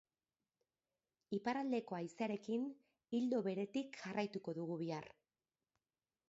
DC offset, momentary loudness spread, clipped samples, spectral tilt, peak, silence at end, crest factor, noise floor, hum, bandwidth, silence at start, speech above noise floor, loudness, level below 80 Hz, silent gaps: under 0.1%; 8 LU; under 0.1%; -5.5 dB/octave; -26 dBFS; 1.2 s; 18 dB; under -90 dBFS; none; 7.6 kHz; 1.3 s; over 48 dB; -43 LUFS; -88 dBFS; none